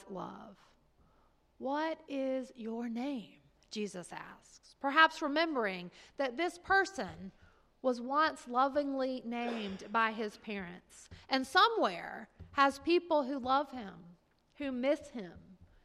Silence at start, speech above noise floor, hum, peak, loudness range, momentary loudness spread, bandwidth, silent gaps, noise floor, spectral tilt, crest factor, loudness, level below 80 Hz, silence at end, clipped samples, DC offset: 0 s; 35 dB; none; -12 dBFS; 8 LU; 19 LU; 14 kHz; none; -69 dBFS; -4 dB/octave; 24 dB; -34 LUFS; -68 dBFS; 0.3 s; under 0.1%; under 0.1%